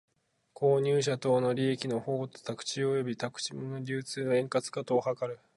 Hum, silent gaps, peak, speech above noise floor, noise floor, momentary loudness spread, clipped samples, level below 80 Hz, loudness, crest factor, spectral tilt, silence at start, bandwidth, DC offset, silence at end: none; none; -14 dBFS; 27 dB; -58 dBFS; 9 LU; under 0.1%; -76 dBFS; -31 LUFS; 16 dB; -5.5 dB/octave; 0.6 s; 11.5 kHz; under 0.1%; 0.2 s